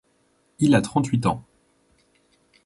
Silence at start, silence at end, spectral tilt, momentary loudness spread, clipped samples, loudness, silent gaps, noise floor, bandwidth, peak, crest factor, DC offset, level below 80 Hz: 0.6 s; 1.25 s; -6.5 dB/octave; 7 LU; under 0.1%; -22 LUFS; none; -65 dBFS; 11.5 kHz; -4 dBFS; 20 dB; under 0.1%; -54 dBFS